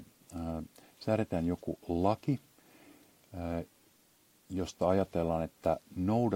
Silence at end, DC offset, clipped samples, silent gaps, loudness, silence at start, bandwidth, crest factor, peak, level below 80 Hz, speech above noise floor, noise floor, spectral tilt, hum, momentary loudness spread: 0 s; under 0.1%; under 0.1%; none; -34 LUFS; 0 s; 16.5 kHz; 20 dB; -14 dBFS; -60 dBFS; 34 dB; -67 dBFS; -7.5 dB/octave; none; 12 LU